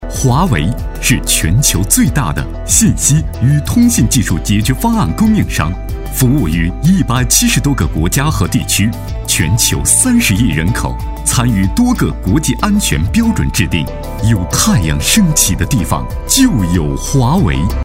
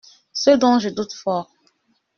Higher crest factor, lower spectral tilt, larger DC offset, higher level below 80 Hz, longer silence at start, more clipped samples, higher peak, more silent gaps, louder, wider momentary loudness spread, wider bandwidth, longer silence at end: second, 12 dB vs 18 dB; about the same, -4 dB/octave vs -3.5 dB/octave; neither; first, -22 dBFS vs -62 dBFS; second, 0 s vs 0.35 s; neither; first, 0 dBFS vs -4 dBFS; neither; first, -12 LUFS vs -19 LUFS; second, 7 LU vs 12 LU; first, 16.5 kHz vs 7 kHz; second, 0 s vs 0.75 s